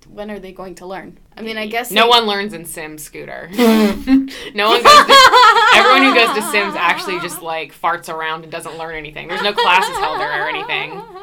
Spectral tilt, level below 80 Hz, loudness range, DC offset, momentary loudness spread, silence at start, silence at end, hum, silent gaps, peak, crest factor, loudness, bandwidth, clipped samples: -2.5 dB/octave; -46 dBFS; 10 LU; under 0.1%; 23 LU; 0.15 s; 0 s; none; none; 0 dBFS; 14 dB; -12 LUFS; 19.5 kHz; 0.2%